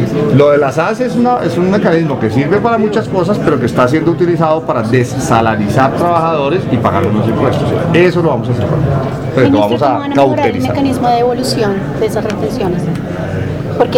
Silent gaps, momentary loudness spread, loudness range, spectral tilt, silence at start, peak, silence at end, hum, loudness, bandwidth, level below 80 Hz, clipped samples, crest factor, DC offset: none; 6 LU; 1 LU; -7 dB/octave; 0 s; 0 dBFS; 0 s; none; -12 LUFS; 16.5 kHz; -36 dBFS; 0.1%; 12 dB; under 0.1%